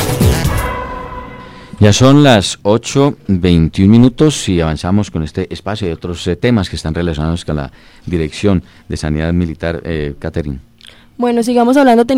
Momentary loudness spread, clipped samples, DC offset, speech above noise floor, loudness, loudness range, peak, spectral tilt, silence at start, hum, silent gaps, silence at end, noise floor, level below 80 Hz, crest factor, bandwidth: 16 LU; 0.3%; under 0.1%; 29 dB; -13 LUFS; 8 LU; 0 dBFS; -6 dB/octave; 0 s; none; none; 0 s; -41 dBFS; -28 dBFS; 12 dB; 16.5 kHz